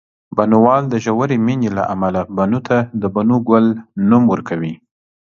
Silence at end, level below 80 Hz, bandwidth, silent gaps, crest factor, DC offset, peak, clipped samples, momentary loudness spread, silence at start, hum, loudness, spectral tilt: 0.5 s; -50 dBFS; 7 kHz; none; 16 dB; under 0.1%; 0 dBFS; under 0.1%; 8 LU; 0.35 s; none; -16 LUFS; -8.5 dB/octave